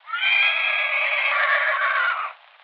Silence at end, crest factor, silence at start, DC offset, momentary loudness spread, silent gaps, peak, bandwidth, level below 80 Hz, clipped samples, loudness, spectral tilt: 0.3 s; 12 dB; 0.05 s; under 0.1%; 6 LU; none; -10 dBFS; 6 kHz; under -90 dBFS; under 0.1%; -19 LUFS; 14.5 dB/octave